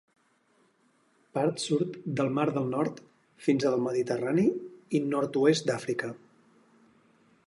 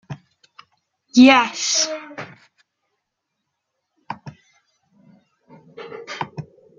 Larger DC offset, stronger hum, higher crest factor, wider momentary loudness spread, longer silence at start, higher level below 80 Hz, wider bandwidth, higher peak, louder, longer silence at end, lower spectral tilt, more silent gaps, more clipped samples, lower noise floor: neither; neither; about the same, 20 dB vs 22 dB; second, 9 LU vs 27 LU; first, 1.35 s vs 0.1 s; second, -74 dBFS vs -68 dBFS; first, 11.5 kHz vs 7.6 kHz; second, -10 dBFS vs -2 dBFS; second, -29 LUFS vs -16 LUFS; first, 1.3 s vs 0.35 s; first, -6 dB/octave vs -2.5 dB/octave; neither; neither; second, -68 dBFS vs -78 dBFS